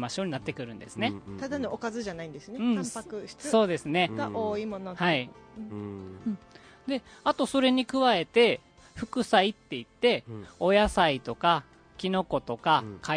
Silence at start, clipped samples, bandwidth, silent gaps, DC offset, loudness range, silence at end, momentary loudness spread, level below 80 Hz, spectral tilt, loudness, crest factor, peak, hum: 0 s; under 0.1%; 10.5 kHz; none; under 0.1%; 6 LU; 0 s; 16 LU; -54 dBFS; -5 dB/octave; -28 LUFS; 22 dB; -6 dBFS; none